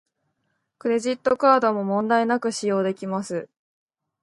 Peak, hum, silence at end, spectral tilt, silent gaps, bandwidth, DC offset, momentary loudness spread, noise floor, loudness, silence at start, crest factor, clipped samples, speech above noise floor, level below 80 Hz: -4 dBFS; none; 0.8 s; -5 dB/octave; none; 11.5 kHz; under 0.1%; 11 LU; -74 dBFS; -22 LUFS; 0.85 s; 20 dB; under 0.1%; 53 dB; -70 dBFS